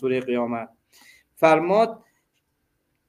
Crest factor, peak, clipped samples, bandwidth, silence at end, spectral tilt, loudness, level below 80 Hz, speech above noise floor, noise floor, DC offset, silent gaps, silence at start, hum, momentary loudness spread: 22 dB; -2 dBFS; under 0.1%; 15.5 kHz; 1.1 s; -6.5 dB/octave; -22 LUFS; -68 dBFS; 51 dB; -73 dBFS; under 0.1%; none; 0 s; none; 13 LU